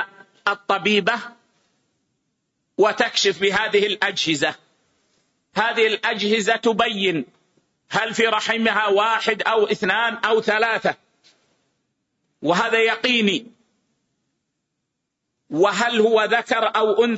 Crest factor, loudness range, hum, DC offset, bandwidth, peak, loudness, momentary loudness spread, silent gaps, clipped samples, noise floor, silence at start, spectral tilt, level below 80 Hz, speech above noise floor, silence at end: 16 dB; 3 LU; none; under 0.1%; 8 kHz; -6 dBFS; -19 LUFS; 8 LU; none; under 0.1%; -78 dBFS; 0 s; -3.5 dB/octave; -66 dBFS; 59 dB; 0 s